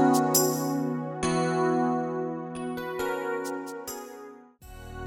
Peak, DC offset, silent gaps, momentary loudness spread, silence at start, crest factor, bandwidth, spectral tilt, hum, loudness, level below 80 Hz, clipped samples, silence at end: -8 dBFS; under 0.1%; none; 19 LU; 0 s; 20 dB; 19.5 kHz; -4.5 dB/octave; none; -28 LUFS; -54 dBFS; under 0.1%; 0 s